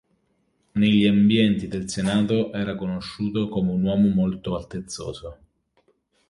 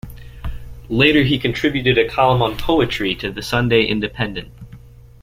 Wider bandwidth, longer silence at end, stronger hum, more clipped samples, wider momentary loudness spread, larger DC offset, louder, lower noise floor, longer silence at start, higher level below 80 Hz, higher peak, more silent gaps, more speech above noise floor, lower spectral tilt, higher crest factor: second, 11.5 kHz vs 16 kHz; first, 0.95 s vs 0.35 s; neither; neither; second, 15 LU vs 19 LU; neither; second, -23 LUFS vs -17 LUFS; first, -68 dBFS vs -41 dBFS; first, 0.75 s vs 0.05 s; second, -50 dBFS vs -36 dBFS; second, -6 dBFS vs 0 dBFS; neither; first, 47 dB vs 24 dB; about the same, -6.5 dB/octave vs -6 dB/octave; about the same, 16 dB vs 18 dB